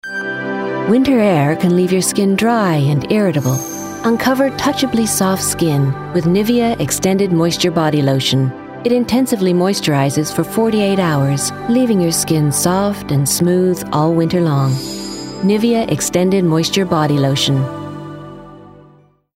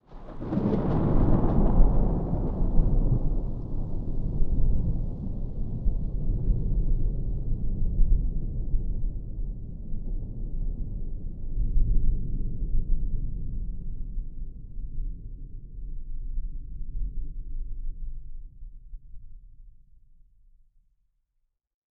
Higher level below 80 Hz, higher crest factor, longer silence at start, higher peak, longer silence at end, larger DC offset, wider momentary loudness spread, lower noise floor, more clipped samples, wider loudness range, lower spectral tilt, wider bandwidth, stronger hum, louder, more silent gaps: second, -46 dBFS vs -26 dBFS; second, 12 dB vs 20 dB; about the same, 0.05 s vs 0.1 s; about the same, -4 dBFS vs -6 dBFS; second, 0.7 s vs 2.2 s; neither; second, 7 LU vs 17 LU; second, -48 dBFS vs -76 dBFS; neither; second, 1 LU vs 15 LU; second, -5 dB/octave vs -12 dB/octave; first, 16.5 kHz vs 1.9 kHz; neither; first, -15 LUFS vs -31 LUFS; neither